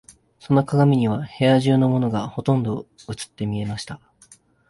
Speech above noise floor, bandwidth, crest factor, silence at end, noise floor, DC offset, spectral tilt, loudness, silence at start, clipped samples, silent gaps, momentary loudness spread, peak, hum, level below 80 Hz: 33 dB; 11.5 kHz; 16 dB; 0.75 s; -53 dBFS; under 0.1%; -7.5 dB/octave; -21 LUFS; 0.5 s; under 0.1%; none; 16 LU; -6 dBFS; none; -54 dBFS